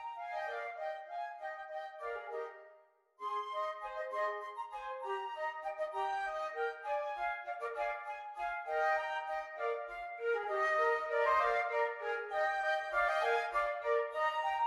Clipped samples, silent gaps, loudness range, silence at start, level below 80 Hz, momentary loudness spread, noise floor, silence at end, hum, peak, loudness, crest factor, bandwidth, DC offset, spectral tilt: under 0.1%; none; 9 LU; 0 s; -72 dBFS; 11 LU; -65 dBFS; 0 s; none; -20 dBFS; -37 LUFS; 18 dB; 12.5 kHz; under 0.1%; -2 dB/octave